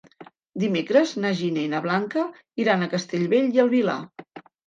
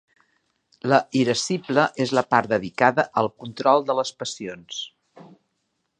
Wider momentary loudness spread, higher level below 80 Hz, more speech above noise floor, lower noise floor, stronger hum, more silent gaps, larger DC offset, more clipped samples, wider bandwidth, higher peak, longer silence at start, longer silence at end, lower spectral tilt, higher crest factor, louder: about the same, 11 LU vs 13 LU; second, -74 dBFS vs -66 dBFS; second, 26 dB vs 53 dB; second, -49 dBFS vs -75 dBFS; neither; neither; neither; neither; second, 7.6 kHz vs 10 kHz; second, -6 dBFS vs -2 dBFS; second, 0.2 s vs 0.85 s; second, 0.3 s vs 0.8 s; first, -6 dB/octave vs -4.5 dB/octave; about the same, 18 dB vs 22 dB; about the same, -23 LUFS vs -22 LUFS